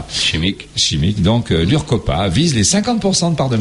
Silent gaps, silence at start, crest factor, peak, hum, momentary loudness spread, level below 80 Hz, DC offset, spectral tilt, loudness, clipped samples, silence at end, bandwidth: none; 0 s; 12 dB; -2 dBFS; none; 3 LU; -32 dBFS; under 0.1%; -4.5 dB/octave; -15 LUFS; under 0.1%; 0 s; 11.5 kHz